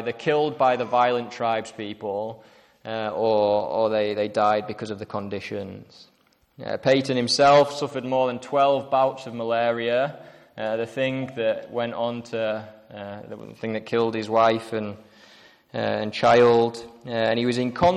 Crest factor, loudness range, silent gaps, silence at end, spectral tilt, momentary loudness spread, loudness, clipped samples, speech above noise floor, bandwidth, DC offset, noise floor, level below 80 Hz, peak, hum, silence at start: 16 dB; 6 LU; none; 0 s; -5 dB/octave; 16 LU; -23 LUFS; under 0.1%; 29 dB; 11.5 kHz; under 0.1%; -52 dBFS; -60 dBFS; -8 dBFS; none; 0 s